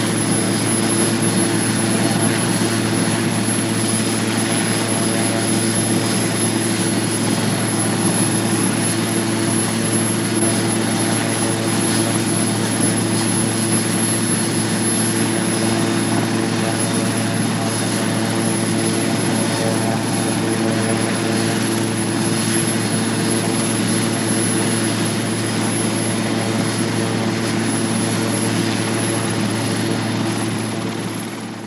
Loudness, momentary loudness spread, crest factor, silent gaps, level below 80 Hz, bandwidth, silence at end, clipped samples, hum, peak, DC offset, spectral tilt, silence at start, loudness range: -18 LUFS; 3 LU; 14 dB; none; -54 dBFS; 15.5 kHz; 0 s; under 0.1%; none; -4 dBFS; under 0.1%; -4 dB/octave; 0 s; 2 LU